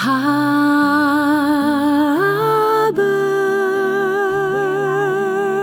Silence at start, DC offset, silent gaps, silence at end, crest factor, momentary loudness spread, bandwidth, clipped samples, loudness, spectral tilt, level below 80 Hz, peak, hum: 0 s; under 0.1%; none; 0 s; 10 dB; 4 LU; 19 kHz; under 0.1%; -16 LUFS; -5.5 dB/octave; -60 dBFS; -4 dBFS; none